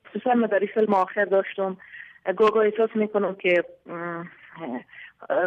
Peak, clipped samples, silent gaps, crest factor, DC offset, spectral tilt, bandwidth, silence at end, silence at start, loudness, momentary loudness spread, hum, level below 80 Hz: -10 dBFS; under 0.1%; none; 14 dB; under 0.1%; -7.5 dB/octave; 6.6 kHz; 0 s; 0.15 s; -24 LUFS; 17 LU; none; -74 dBFS